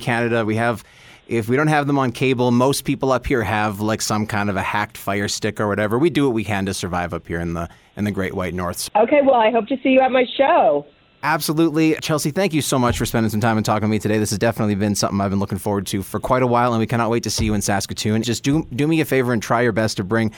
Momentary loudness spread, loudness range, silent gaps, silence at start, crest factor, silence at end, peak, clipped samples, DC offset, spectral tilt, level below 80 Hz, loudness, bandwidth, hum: 8 LU; 4 LU; none; 0 s; 16 dB; 0 s; -4 dBFS; under 0.1%; under 0.1%; -5 dB/octave; -44 dBFS; -19 LUFS; 19.5 kHz; none